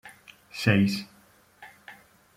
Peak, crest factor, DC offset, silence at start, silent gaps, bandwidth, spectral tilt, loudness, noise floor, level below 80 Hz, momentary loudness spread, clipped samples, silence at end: -8 dBFS; 22 dB; under 0.1%; 0.05 s; none; 16 kHz; -6 dB/octave; -25 LUFS; -59 dBFS; -64 dBFS; 26 LU; under 0.1%; 0.45 s